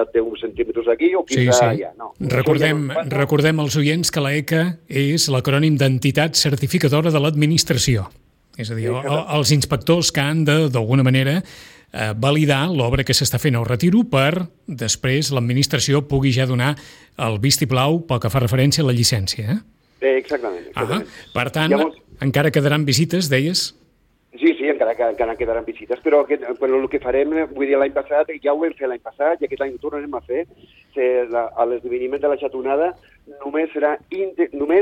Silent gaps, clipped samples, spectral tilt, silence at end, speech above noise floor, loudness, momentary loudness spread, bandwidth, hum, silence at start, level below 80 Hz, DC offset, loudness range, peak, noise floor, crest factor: none; under 0.1%; -5 dB/octave; 0 s; 41 dB; -19 LUFS; 9 LU; 17 kHz; none; 0 s; -46 dBFS; under 0.1%; 4 LU; -4 dBFS; -59 dBFS; 16 dB